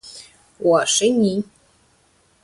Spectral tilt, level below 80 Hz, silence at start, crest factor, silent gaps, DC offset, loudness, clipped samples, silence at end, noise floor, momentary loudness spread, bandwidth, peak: -3.5 dB/octave; -62 dBFS; 0.05 s; 16 dB; none; under 0.1%; -18 LUFS; under 0.1%; 1 s; -59 dBFS; 22 LU; 11.5 kHz; -6 dBFS